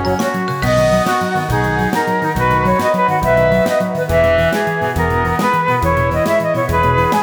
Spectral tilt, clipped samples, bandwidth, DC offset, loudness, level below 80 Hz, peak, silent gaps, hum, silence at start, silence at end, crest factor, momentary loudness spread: -6 dB/octave; under 0.1%; over 20 kHz; under 0.1%; -15 LUFS; -30 dBFS; -2 dBFS; none; none; 0 s; 0 s; 14 dB; 4 LU